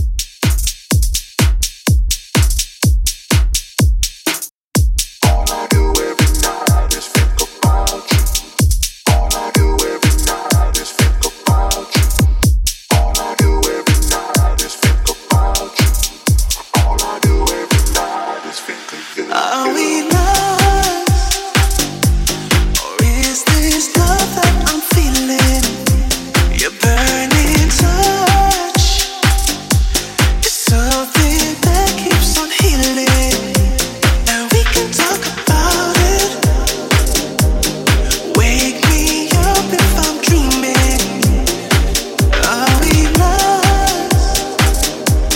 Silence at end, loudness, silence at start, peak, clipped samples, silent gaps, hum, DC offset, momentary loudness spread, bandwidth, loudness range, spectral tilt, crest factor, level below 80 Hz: 0 s; -14 LUFS; 0 s; 0 dBFS; under 0.1%; 4.51-4.71 s; none; under 0.1%; 4 LU; 17 kHz; 3 LU; -4 dB/octave; 14 dB; -16 dBFS